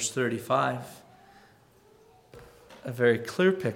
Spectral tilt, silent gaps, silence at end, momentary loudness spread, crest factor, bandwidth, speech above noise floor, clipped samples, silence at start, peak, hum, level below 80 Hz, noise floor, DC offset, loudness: -4.5 dB/octave; none; 0 s; 16 LU; 20 dB; 16.5 kHz; 32 dB; under 0.1%; 0 s; -10 dBFS; none; -68 dBFS; -59 dBFS; under 0.1%; -27 LUFS